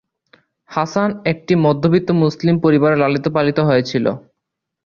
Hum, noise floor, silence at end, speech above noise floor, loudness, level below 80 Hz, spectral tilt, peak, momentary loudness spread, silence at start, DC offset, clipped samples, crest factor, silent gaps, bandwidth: none; -79 dBFS; 0.65 s; 64 dB; -16 LUFS; -54 dBFS; -7.5 dB/octave; -2 dBFS; 8 LU; 0.7 s; under 0.1%; under 0.1%; 14 dB; none; 7 kHz